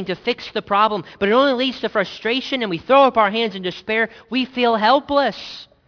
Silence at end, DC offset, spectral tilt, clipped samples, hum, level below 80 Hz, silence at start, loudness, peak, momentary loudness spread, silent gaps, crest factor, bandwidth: 0.25 s; under 0.1%; -5.5 dB/octave; under 0.1%; none; -56 dBFS; 0 s; -18 LUFS; -2 dBFS; 9 LU; none; 18 dB; 5.4 kHz